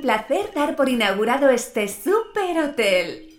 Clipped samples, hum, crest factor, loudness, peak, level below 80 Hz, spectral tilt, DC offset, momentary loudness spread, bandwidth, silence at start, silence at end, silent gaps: under 0.1%; none; 16 dB; -21 LUFS; -4 dBFS; -54 dBFS; -3.5 dB/octave; under 0.1%; 5 LU; 17 kHz; 0 s; 0.1 s; none